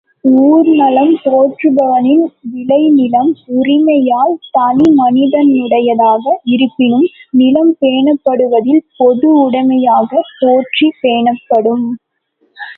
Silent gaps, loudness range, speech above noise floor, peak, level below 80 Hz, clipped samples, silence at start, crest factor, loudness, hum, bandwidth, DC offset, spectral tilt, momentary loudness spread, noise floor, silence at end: none; 1 LU; 49 dB; 0 dBFS; -58 dBFS; under 0.1%; 0.25 s; 10 dB; -10 LUFS; none; 4.2 kHz; under 0.1%; -8 dB/octave; 5 LU; -59 dBFS; 0.05 s